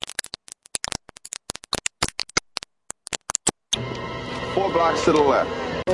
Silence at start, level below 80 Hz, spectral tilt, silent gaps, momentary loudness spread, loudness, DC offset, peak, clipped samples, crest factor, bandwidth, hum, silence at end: 0.05 s; -48 dBFS; -3 dB/octave; none; 16 LU; -24 LUFS; under 0.1%; -4 dBFS; under 0.1%; 22 dB; 11.5 kHz; none; 0 s